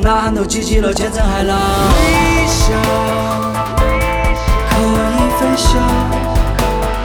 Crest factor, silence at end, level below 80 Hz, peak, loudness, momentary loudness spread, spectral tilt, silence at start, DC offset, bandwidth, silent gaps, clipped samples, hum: 12 dB; 0 s; -18 dBFS; -2 dBFS; -14 LUFS; 4 LU; -5 dB/octave; 0 s; under 0.1%; over 20 kHz; none; under 0.1%; none